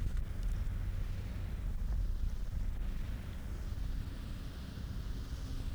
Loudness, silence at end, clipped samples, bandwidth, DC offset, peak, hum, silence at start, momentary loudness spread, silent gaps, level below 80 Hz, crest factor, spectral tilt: -42 LUFS; 0 s; under 0.1%; over 20 kHz; under 0.1%; -24 dBFS; none; 0 s; 5 LU; none; -38 dBFS; 14 dB; -6.5 dB/octave